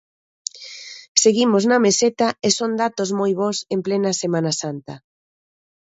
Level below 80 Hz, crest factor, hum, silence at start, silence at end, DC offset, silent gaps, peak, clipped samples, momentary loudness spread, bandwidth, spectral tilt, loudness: -66 dBFS; 20 dB; none; 0.55 s; 1 s; under 0.1%; 1.08-1.15 s; 0 dBFS; under 0.1%; 17 LU; 8.2 kHz; -3.5 dB/octave; -19 LUFS